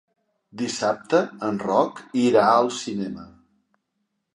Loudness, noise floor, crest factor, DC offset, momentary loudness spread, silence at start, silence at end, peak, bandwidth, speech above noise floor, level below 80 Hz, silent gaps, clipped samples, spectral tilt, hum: -22 LUFS; -76 dBFS; 20 dB; under 0.1%; 13 LU; 0.55 s; 1.05 s; -4 dBFS; 11.5 kHz; 54 dB; -66 dBFS; none; under 0.1%; -5 dB/octave; none